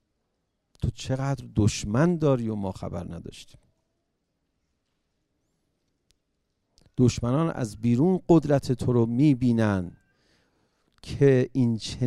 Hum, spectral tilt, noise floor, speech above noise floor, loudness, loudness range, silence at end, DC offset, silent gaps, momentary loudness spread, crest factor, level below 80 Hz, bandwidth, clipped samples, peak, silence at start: none; -7 dB/octave; -77 dBFS; 53 dB; -24 LUFS; 10 LU; 0 s; under 0.1%; none; 14 LU; 20 dB; -50 dBFS; 12 kHz; under 0.1%; -6 dBFS; 0.8 s